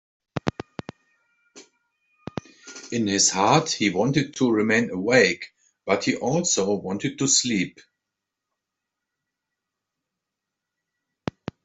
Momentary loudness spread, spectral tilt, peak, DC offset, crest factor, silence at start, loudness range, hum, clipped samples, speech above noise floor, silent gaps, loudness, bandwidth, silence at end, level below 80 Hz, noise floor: 19 LU; -3.5 dB/octave; -4 dBFS; under 0.1%; 22 dB; 0.35 s; 8 LU; none; under 0.1%; 63 dB; none; -22 LUFS; 8.2 kHz; 3.95 s; -62 dBFS; -84 dBFS